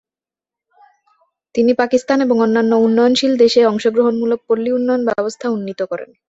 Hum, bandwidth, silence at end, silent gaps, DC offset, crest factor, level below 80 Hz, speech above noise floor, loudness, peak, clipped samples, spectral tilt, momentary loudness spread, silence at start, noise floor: none; 8 kHz; 0.25 s; none; under 0.1%; 16 dB; -60 dBFS; 75 dB; -15 LUFS; 0 dBFS; under 0.1%; -5 dB/octave; 9 LU; 1.55 s; -90 dBFS